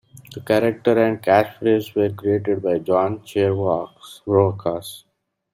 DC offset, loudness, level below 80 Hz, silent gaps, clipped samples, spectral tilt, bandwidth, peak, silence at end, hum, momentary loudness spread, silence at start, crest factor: under 0.1%; -20 LUFS; -60 dBFS; none; under 0.1%; -7 dB/octave; 16 kHz; -2 dBFS; 0.55 s; none; 14 LU; 0.15 s; 18 dB